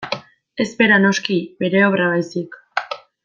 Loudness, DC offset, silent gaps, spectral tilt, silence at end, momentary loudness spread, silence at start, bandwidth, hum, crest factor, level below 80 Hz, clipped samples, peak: -18 LUFS; under 0.1%; none; -5 dB/octave; 0.25 s; 15 LU; 0 s; 7.6 kHz; none; 16 dB; -64 dBFS; under 0.1%; -2 dBFS